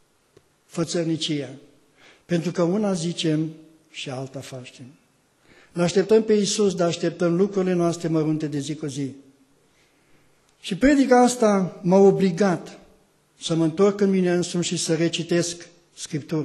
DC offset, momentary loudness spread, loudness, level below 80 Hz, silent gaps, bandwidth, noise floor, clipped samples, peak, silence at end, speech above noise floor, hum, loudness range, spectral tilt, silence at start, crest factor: under 0.1%; 18 LU; -22 LUFS; -56 dBFS; none; 12.5 kHz; -61 dBFS; under 0.1%; -6 dBFS; 0 s; 39 dB; none; 7 LU; -5.5 dB/octave; 0.75 s; 18 dB